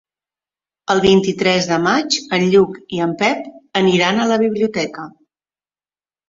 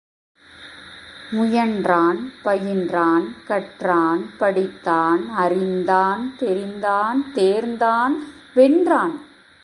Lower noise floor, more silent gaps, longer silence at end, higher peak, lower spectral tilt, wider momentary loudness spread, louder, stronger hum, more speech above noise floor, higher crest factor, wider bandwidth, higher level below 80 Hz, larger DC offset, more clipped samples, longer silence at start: first, under -90 dBFS vs -42 dBFS; neither; first, 1.2 s vs 0.4 s; about the same, -2 dBFS vs -2 dBFS; second, -4.5 dB/octave vs -6.5 dB/octave; about the same, 11 LU vs 9 LU; first, -16 LUFS vs -20 LUFS; neither; first, over 74 dB vs 23 dB; about the same, 16 dB vs 18 dB; second, 7.8 kHz vs 11.5 kHz; first, -54 dBFS vs -62 dBFS; neither; neither; first, 0.9 s vs 0.6 s